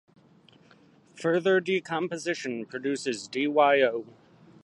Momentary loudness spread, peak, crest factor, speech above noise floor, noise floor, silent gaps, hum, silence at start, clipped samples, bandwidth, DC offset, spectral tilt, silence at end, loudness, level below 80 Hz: 11 LU; -10 dBFS; 18 dB; 32 dB; -58 dBFS; none; none; 1.15 s; under 0.1%; 11.5 kHz; under 0.1%; -4.5 dB/octave; 0.6 s; -27 LUFS; -80 dBFS